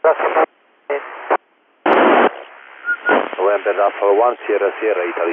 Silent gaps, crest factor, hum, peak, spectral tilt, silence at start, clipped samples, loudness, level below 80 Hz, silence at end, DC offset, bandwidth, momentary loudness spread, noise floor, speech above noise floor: none; 16 dB; none; 0 dBFS; -7 dB/octave; 0.05 s; under 0.1%; -17 LUFS; -74 dBFS; 0 s; under 0.1%; 4 kHz; 12 LU; -40 dBFS; 24 dB